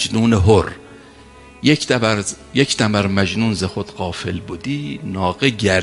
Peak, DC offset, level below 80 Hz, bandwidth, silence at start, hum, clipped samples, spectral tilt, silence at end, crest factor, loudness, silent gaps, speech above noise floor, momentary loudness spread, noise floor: 0 dBFS; under 0.1%; -34 dBFS; 11.5 kHz; 0 s; none; under 0.1%; -5 dB/octave; 0 s; 18 dB; -18 LUFS; none; 25 dB; 11 LU; -42 dBFS